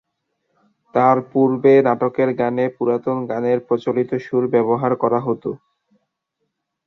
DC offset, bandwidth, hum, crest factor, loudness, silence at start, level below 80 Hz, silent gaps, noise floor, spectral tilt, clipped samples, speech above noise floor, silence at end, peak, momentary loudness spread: under 0.1%; 6.2 kHz; none; 18 dB; -18 LUFS; 0.95 s; -64 dBFS; none; -75 dBFS; -9.5 dB/octave; under 0.1%; 58 dB; 1.3 s; -2 dBFS; 9 LU